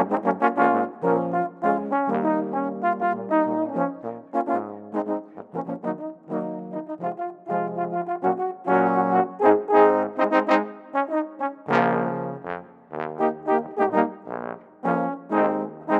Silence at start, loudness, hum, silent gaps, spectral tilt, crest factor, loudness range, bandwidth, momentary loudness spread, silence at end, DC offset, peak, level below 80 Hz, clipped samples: 0 s; -24 LUFS; none; none; -8.5 dB/octave; 20 dB; 8 LU; 7.8 kHz; 13 LU; 0 s; under 0.1%; -2 dBFS; -74 dBFS; under 0.1%